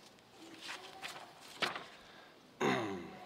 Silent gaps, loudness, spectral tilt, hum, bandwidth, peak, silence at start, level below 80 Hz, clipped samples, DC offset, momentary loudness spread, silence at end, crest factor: none; -40 LUFS; -4 dB/octave; none; 16 kHz; -20 dBFS; 0 s; -80 dBFS; under 0.1%; under 0.1%; 22 LU; 0 s; 22 dB